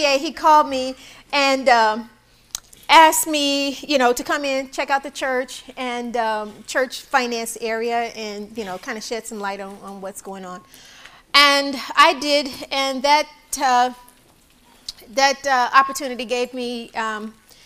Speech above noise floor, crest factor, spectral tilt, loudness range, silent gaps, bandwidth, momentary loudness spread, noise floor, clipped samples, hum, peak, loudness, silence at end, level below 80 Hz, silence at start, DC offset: 34 dB; 20 dB; -1 dB/octave; 8 LU; none; 16 kHz; 18 LU; -54 dBFS; under 0.1%; none; 0 dBFS; -19 LUFS; 0.35 s; -56 dBFS; 0 s; under 0.1%